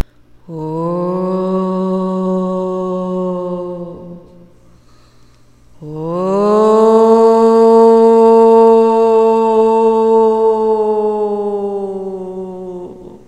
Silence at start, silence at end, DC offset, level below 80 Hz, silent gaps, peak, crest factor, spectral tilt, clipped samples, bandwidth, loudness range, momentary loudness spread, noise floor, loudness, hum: 0.5 s; 0.1 s; 0.4%; -52 dBFS; none; 0 dBFS; 12 dB; -8 dB/octave; under 0.1%; 8.6 kHz; 14 LU; 19 LU; -47 dBFS; -12 LUFS; none